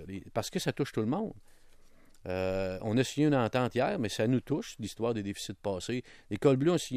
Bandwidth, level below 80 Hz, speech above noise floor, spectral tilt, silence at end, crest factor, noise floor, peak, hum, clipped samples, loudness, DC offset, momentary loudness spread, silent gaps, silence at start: 15 kHz; -58 dBFS; 25 dB; -6 dB/octave; 0 s; 18 dB; -55 dBFS; -12 dBFS; none; under 0.1%; -32 LUFS; under 0.1%; 11 LU; none; 0 s